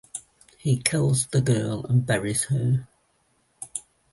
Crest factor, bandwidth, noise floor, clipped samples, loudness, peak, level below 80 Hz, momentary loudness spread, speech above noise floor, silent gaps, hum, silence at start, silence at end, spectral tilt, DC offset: 24 dB; 12 kHz; -67 dBFS; under 0.1%; -24 LUFS; -2 dBFS; -56 dBFS; 14 LU; 44 dB; none; none; 0.15 s; 0.3 s; -5 dB/octave; under 0.1%